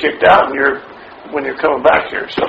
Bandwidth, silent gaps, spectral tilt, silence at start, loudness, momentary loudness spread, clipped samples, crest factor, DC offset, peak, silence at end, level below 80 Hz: 6.6 kHz; none; -6 dB/octave; 0 s; -13 LUFS; 12 LU; under 0.1%; 14 dB; under 0.1%; 0 dBFS; 0 s; -46 dBFS